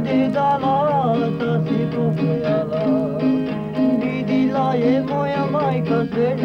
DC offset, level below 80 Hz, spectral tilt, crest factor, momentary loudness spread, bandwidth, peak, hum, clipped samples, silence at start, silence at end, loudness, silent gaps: under 0.1%; -52 dBFS; -9 dB/octave; 12 dB; 3 LU; 6.4 kHz; -8 dBFS; none; under 0.1%; 0 s; 0 s; -19 LUFS; none